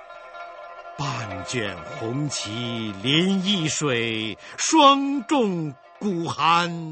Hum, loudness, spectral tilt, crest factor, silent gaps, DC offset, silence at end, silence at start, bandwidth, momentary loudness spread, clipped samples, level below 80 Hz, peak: none; -23 LUFS; -4 dB/octave; 22 dB; none; under 0.1%; 0 s; 0 s; 8.8 kHz; 19 LU; under 0.1%; -62 dBFS; -2 dBFS